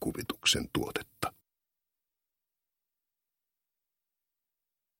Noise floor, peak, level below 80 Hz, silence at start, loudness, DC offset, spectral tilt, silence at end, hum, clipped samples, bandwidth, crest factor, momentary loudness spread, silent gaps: -89 dBFS; -14 dBFS; -58 dBFS; 0 s; -32 LUFS; under 0.1%; -2.5 dB/octave; 3.7 s; none; under 0.1%; 16.5 kHz; 26 dB; 11 LU; none